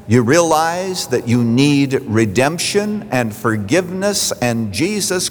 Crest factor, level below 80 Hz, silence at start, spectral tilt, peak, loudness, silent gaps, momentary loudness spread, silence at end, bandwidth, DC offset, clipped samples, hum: 14 dB; -52 dBFS; 0 s; -4.5 dB/octave; -2 dBFS; -16 LUFS; none; 6 LU; 0 s; over 20 kHz; under 0.1%; under 0.1%; none